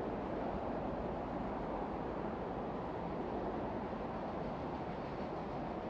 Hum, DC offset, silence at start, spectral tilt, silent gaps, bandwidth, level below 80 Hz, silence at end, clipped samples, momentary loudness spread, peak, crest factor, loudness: none; under 0.1%; 0 s; -8.5 dB/octave; none; 8 kHz; -54 dBFS; 0 s; under 0.1%; 2 LU; -28 dBFS; 12 dB; -41 LUFS